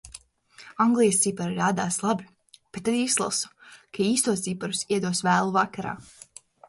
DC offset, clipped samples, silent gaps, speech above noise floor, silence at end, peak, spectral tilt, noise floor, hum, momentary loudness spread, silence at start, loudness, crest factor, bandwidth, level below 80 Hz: under 0.1%; under 0.1%; none; 28 dB; 0.65 s; -8 dBFS; -3.5 dB/octave; -53 dBFS; none; 17 LU; 0.05 s; -25 LUFS; 18 dB; 11.5 kHz; -64 dBFS